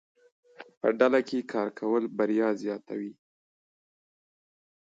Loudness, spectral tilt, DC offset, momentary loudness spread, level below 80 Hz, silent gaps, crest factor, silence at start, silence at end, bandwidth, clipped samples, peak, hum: -28 LUFS; -6.5 dB/octave; under 0.1%; 13 LU; -82 dBFS; 0.77-0.81 s; 22 dB; 0.6 s; 1.75 s; 7.8 kHz; under 0.1%; -8 dBFS; none